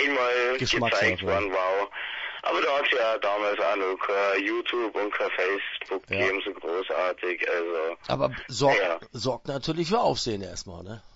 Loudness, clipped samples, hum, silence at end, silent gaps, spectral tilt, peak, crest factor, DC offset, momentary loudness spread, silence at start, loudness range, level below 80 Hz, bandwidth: -26 LUFS; under 0.1%; none; 0.1 s; none; -4 dB/octave; -10 dBFS; 18 dB; under 0.1%; 8 LU; 0 s; 3 LU; -56 dBFS; 8 kHz